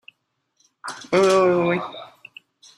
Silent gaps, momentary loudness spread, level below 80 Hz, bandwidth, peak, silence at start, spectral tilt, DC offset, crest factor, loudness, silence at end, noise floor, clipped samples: none; 22 LU; -66 dBFS; 12.5 kHz; -4 dBFS; 0.85 s; -5.5 dB/octave; under 0.1%; 18 dB; -19 LUFS; 0.7 s; -72 dBFS; under 0.1%